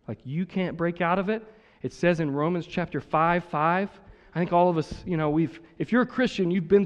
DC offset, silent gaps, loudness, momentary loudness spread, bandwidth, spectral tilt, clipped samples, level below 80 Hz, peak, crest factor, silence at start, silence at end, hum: under 0.1%; none; -26 LUFS; 10 LU; 8.8 kHz; -7.5 dB/octave; under 0.1%; -54 dBFS; -8 dBFS; 18 dB; 0.1 s; 0 s; none